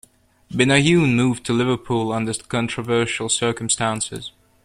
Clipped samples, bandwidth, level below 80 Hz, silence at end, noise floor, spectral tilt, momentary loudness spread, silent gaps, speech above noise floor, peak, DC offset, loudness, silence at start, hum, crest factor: under 0.1%; 13.5 kHz; -52 dBFS; 0.35 s; -46 dBFS; -4.5 dB/octave; 10 LU; none; 26 dB; -2 dBFS; under 0.1%; -20 LUFS; 0.5 s; none; 18 dB